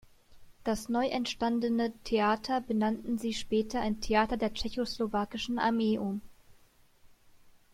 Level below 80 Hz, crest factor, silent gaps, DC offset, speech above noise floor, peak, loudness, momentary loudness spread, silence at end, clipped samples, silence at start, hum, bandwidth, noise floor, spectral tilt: -52 dBFS; 18 dB; none; under 0.1%; 31 dB; -14 dBFS; -31 LUFS; 6 LU; 0.25 s; under 0.1%; 0.3 s; none; 15 kHz; -62 dBFS; -5 dB/octave